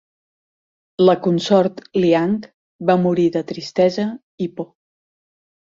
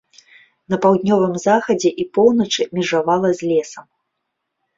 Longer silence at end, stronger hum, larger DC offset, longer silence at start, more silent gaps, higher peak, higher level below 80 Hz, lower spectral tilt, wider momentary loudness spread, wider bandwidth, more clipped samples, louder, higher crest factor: first, 1.1 s vs 0.95 s; neither; neither; first, 1 s vs 0.7 s; first, 2.54-2.79 s, 4.23-4.38 s vs none; about the same, -2 dBFS vs -2 dBFS; about the same, -62 dBFS vs -60 dBFS; first, -7 dB/octave vs -5 dB/octave; first, 12 LU vs 5 LU; about the same, 7.6 kHz vs 7.8 kHz; neither; about the same, -18 LUFS vs -17 LUFS; about the same, 18 dB vs 16 dB